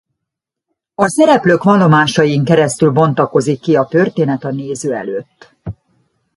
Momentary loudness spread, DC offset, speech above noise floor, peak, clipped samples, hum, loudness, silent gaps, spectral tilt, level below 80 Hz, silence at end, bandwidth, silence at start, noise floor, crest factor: 16 LU; under 0.1%; 67 dB; 0 dBFS; under 0.1%; none; -13 LUFS; none; -6 dB/octave; -50 dBFS; 0.65 s; 11.5 kHz; 1 s; -80 dBFS; 14 dB